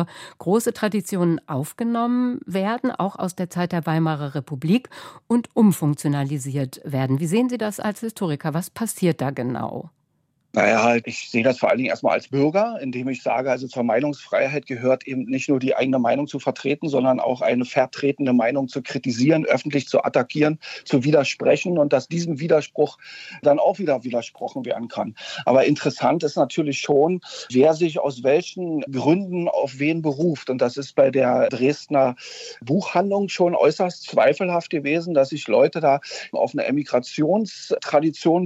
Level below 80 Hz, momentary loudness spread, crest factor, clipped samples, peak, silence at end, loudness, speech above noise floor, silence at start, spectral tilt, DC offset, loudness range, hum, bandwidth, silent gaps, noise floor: -70 dBFS; 9 LU; 18 dB; under 0.1%; -4 dBFS; 0 s; -21 LUFS; 48 dB; 0 s; -6 dB/octave; under 0.1%; 3 LU; none; 16 kHz; none; -69 dBFS